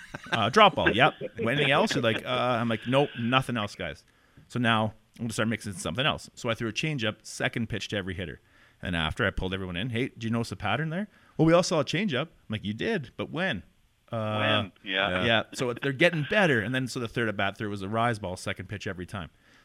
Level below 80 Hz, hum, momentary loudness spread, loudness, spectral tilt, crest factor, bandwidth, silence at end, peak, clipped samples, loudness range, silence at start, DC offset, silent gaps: -52 dBFS; none; 13 LU; -27 LUFS; -5 dB/octave; 24 dB; 15.5 kHz; 0.35 s; -4 dBFS; under 0.1%; 5 LU; 0 s; under 0.1%; none